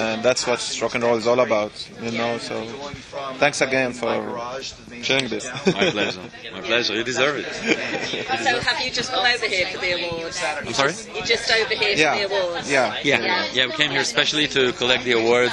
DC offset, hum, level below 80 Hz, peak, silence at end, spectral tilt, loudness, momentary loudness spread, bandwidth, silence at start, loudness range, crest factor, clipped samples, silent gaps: under 0.1%; none; -54 dBFS; 0 dBFS; 0 s; -3 dB/octave; -21 LUFS; 11 LU; 11.5 kHz; 0 s; 4 LU; 22 dB; under 0.1%; none